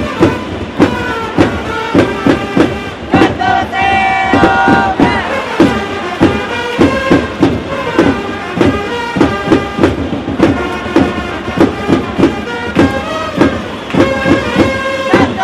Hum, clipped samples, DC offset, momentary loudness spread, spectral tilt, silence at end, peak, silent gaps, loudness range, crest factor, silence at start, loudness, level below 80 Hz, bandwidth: none; under 0.1%; under 0.1%; 7 LU; -6 dB/octave; 0 s; 0 dBFS; none; 2 LU; 12 dB; 0 s; -12 LUFS; -32 dBFS; 13 kHz